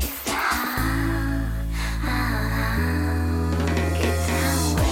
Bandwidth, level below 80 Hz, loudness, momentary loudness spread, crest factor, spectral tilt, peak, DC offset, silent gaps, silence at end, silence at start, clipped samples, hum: 17 kHz; -30 dBFS; -24 LUFS; 5 LU; 12 dB; -5 dB/octave; -10 dBFS; under 0.1%; none; 0 s; 0 s; under 0.1%; none